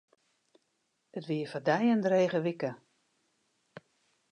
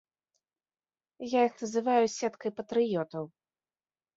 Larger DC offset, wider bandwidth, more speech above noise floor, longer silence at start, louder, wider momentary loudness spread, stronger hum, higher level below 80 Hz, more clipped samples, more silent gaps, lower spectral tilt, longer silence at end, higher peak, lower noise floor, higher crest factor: neither; first, 9.8 kHz vs 7.8 kHz; second, 49 dB vs over 61 dB; about the same, 1.15 s vs 1.2 s; about the same, -30 LUFS vs -30 LUFS; about the same, 13 LU vs 13 LU; neither; second, -84 dBFS vs -78 dBFS; neither; neither; first, -7 dB/octave vs -5 dB/octave; first, 1.55 s vs 0.9 s; about the same, -14 dBFS vs -12 dBFS; second, -78 dBFS vs under -90 dBFS; about the same, 20 dB vs 20 dB